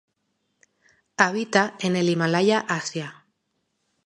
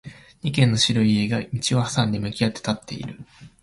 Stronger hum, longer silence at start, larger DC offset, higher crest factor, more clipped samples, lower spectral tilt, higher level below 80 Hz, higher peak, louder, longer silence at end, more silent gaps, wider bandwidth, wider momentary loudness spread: neither; first, 1.2 s vs 0.05 s; neither; first, 24 dB vs 18 dB; neither; about the same, -4.5 dB/octave vs -5 dB/octave; second, -74 dBFS vs -50 dBFS; first, -2 dBFS vs -6 dBFS; about the same, -22 LUFS vs -22 LUFS; first, 0.95 s vs 0.15 s; neither; about the same, 11.5 kHz vs 11.5 kHz; second, 13 LU vs 16 LU